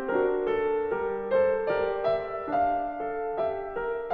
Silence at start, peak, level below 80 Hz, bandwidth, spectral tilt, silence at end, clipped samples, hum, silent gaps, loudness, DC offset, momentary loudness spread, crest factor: 0 s; -14 dBFS; -54 dBFS; 5 kHz; -8 dB/octave; 0 s; under 0.1%; none; none; -28 LUFS; under 0.1%; 7 LU; 14 dB